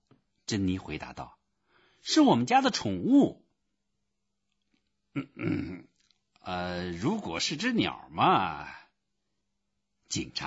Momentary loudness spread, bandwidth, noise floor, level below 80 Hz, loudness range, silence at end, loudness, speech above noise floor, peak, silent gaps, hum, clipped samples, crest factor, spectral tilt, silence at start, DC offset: 18 LU; 8 kHz; -83 dBFS; -60 dBFS; 10 LU; 0 s; -28 LUFS; 55 dB; -10 dBFS; none; none; under 0.1%; 20 dB; -4.5 dB/octave; 0.5 s; under 0.1%